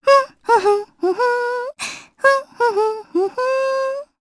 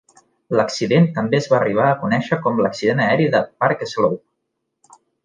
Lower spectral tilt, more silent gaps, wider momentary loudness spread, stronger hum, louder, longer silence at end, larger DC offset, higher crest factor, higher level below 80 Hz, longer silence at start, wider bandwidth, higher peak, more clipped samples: second, -2.5 dB/octave vs -6.5 dB/octave; neither; first, 9 LU vs 4 LU; neither; about the same, -19 LUFS vs -18 LUFS; second, 0.15 s vs 1.05 s; neither; about the same, 16 dB vs 16 dB; second, -68 dBFS vs -62 dBFS; second, 0.05 s vs 0.5 s; first, 11 kHz vs 9.6 kHz; about the same, -2 dBFS vs -2 dBFS; neither